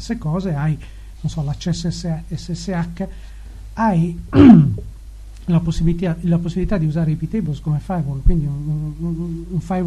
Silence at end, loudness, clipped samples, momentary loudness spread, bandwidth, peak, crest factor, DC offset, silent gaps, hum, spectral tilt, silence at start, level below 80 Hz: 0 s; -19 LUFS; 0.2%; 14 LU; 10.5 kHz; 0 dBFS; 18 dB; under 0.1%; none; none; -8 dB/octave; 0 s; -28 dBFS